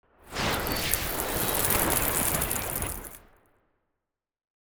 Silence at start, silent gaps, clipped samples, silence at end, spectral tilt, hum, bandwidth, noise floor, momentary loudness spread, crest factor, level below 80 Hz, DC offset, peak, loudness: 0.25 s; none; under 0.1%; 1.5 s; -2.5 dB/octave; none; over 20 kHz; -86 dBFS; 11 LU; 26 dB; -42 dBFS; under 0.1%; -4 dBFS; -26 LUFS